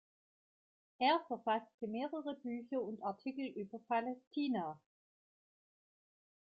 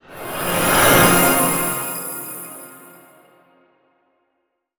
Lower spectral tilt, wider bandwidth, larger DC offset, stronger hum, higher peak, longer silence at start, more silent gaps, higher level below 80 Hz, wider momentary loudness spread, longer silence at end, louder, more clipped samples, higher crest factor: about the same, -3 dB/octave vs -3 dB/octave; second, 5.2 kHz vs over 20 kHz; neither; neither; second, -20 dBFS vs 0 dBFS; first, 1 s vs 0.1 s; first, 1.74-1.78 s, 4.27-4.31 s vs none; second, -88 dBFS vs -44 dBFS; second, 10 LU vs 19 LU; second, 1.65 s vs 2 s; second, -40 LUFS vs -16 LUFS; neither; about the same, 20 dB vs 20 dB